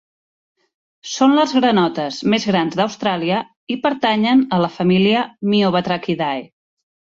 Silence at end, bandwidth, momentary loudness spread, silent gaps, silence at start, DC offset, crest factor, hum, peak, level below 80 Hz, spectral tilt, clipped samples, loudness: 0.65 s; 7.6 kHz; 8 LU; 3.56-3.67 s; 1.05 s; under 0.1%; 16 dB; none; -2 dBFS; -60 dBFS; -5.5 dB/octave; under 0.1%; -17 LUFS